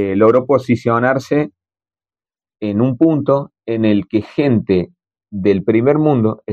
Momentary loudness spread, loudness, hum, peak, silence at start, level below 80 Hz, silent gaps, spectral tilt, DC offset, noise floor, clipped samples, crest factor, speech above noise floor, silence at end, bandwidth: 8 LU; -15 LUFS; none; -2 dBFS; 0 s; -54 dBFS; none; -8.5 dB/octave; under 0.1%; under -90 dBFS; under 0.1%; 14 dB; over 76 dB; 0 s; 7.8 kHz